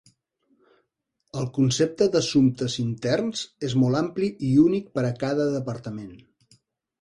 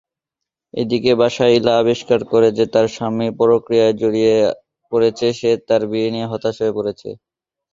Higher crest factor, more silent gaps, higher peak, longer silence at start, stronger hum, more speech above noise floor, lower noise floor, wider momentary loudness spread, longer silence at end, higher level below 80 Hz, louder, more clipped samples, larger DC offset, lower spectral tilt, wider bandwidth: about the same, 18 dB vs 16 dB; neither; second, -8 dBFS vs 0 dBFS; first, 1.35 s vs 0.75 s; neither; second, 53 dB vs 68 dB; second, -77 dBFS vs -84 dBFS; first, 13 LU vs 9 LU; first, 0.85 s vs 0.6 s; about the same, -58 dBFS vs -56 dBFS; second, -24 LUFS vs -17 LUFS; neither; neither; about the same, -6 dB/octave vs -6 dB/octave; first, 11.5 kHz vs 7.6 kHz